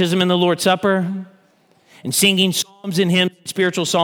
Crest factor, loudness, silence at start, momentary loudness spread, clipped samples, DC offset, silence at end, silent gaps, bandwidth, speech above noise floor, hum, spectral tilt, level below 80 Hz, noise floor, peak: 18 dB; -17 LUFS; 0 s; 8 LU; under 0.1%; under 0.1%; 0 s; none; 19.5 kHz; 39 dB; none; -4 dB/octave; -68 dBFS; -56 dBFS; -2 dBFS